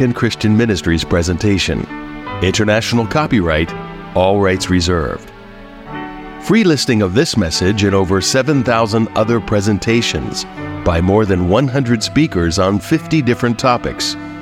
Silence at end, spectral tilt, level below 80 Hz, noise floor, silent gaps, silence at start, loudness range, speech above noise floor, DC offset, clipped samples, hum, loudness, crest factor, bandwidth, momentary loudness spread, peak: 0 s; -5 dB/octave; -34 dBFS; -35 dBFS; none; 0 s; 2 LU; 21 dB; under 0.1%; under 0.1%; none; -15 LUFS; 14 dB; 16 kHz; 10 LU; 0 dBFS